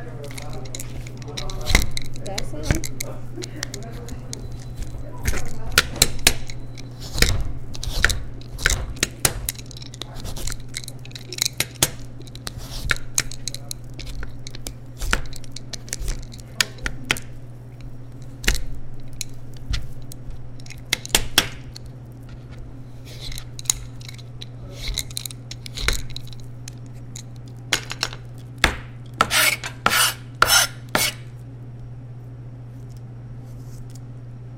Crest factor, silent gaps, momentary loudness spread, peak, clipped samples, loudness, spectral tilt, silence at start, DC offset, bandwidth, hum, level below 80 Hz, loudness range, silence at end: 26 dB; none; 19 LU; 0 dBFS; under 0.1%; -24 LUFS; -2 dB/octave; 0 s; under 0.1%; 17 kHz; none; -32 dBFS; 11 LU; 0 s